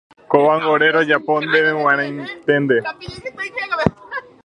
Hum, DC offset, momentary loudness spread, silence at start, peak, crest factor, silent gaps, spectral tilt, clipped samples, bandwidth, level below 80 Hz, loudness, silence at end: none; under 0.1%; 14 LU; 0.3 s; 0 dBFS; 18 dB; none; -6.5 dB/octave; under 0.1%; 9.8 kHz; -50 dBFS; -17 LUFS; 0.25 s